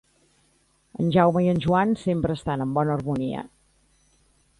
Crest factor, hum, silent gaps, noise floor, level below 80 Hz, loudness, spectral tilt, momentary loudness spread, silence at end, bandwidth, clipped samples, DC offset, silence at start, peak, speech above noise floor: 18 dB; none; none; -64 dBFS; -50 dBFS; -23 LUFS; -8 dB/octave; 12 LU; 1.1 s; 11 kHz; under 0.1%; under 0.1%; 0.95 s; -6 dBFS; 42 dB